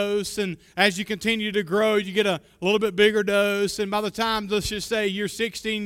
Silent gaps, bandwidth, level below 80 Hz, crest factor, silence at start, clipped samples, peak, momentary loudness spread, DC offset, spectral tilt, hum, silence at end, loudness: none; 16.5 kHz; -52 dBFS; 20 dB; 0 s; under 0.1%; -4 dBFS; 7 LU; under 0.1%; -4 dB/octave; none; 0 s; -23 LUFS